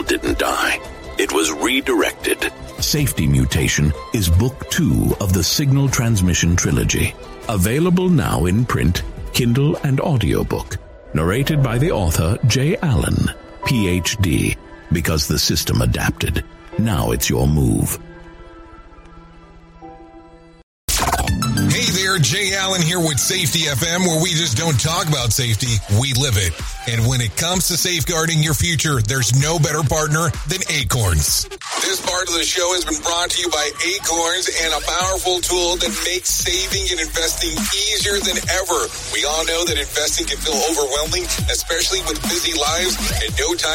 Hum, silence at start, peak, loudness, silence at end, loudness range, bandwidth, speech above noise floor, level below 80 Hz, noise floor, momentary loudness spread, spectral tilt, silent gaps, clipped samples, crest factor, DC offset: none; 0 s; -4 dBFS; -18 LUFS; 0 s; 2 LU; 16.5 kHz; 25 dB; -30 dBFS; -43 dBFS; 5 LU; -3.5 dB/octave; 20.63-20.88 s; under 0.1%; 14 dB; under 0.1%